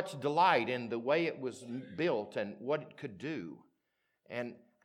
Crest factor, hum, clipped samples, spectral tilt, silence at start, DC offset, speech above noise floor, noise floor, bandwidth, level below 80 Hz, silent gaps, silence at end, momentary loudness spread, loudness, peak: 22 dB; none; under 0.1%; -5.5 dB/octave; 0 s; under 0.1%; 47 dB; -82 dBFS; 13.5 kHz; -86 dBFS; none; 0.3 s; 16 LU; -35 LUFS; -14 dBFS